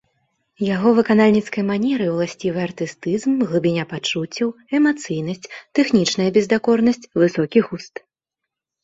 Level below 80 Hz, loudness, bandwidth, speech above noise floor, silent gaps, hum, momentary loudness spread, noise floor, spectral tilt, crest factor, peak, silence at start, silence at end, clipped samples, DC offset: -60 dBFS; -19 LUFS; 8 kHz; 65 dB; none; none; 10 LU; -83 dBFS; -5.5 dB/octave; 18 dB; -2 dBFS; 0.6 s; 0.95 s; under 0.1%; under 0.1%